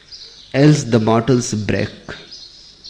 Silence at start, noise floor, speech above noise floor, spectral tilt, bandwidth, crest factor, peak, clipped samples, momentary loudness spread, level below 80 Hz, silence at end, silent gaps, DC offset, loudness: 0.1 s; -40 dBFS; 25 dB; -6 dB/octave; 10 kHz; 16 dB; -2 dBFS; under 0.1%; 22 LU; -46 dBFS; 0 s; none; under 0.1%; -16 LUFS